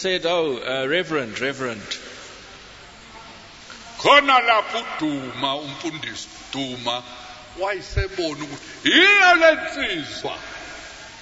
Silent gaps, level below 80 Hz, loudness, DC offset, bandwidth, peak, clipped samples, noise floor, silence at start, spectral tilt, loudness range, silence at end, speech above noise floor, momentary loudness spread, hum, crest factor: none; -44 dBFS; -20 LUFS; under 0.1%; 8 kHz; -2 dBFS; under 0.1%; -43 dBFS; 0 s; -3 dB/octave; 10 LU; 0 s; 22 dB; 25 LU; none; 20 dB